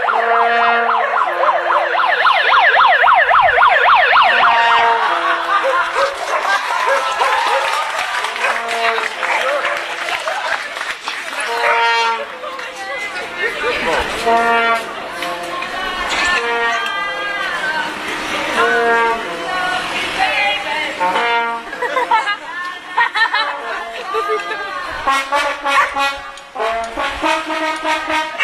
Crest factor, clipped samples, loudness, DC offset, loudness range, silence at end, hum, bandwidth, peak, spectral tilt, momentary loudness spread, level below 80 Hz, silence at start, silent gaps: 14 dB; under 0.1%; -15 LUFS; under 0.1%; 7 LU; 0 s; none; 14 kHz; -2 dBFS; -1.5 dB/octave; 12 LU; -48 dBFS; 0 s; none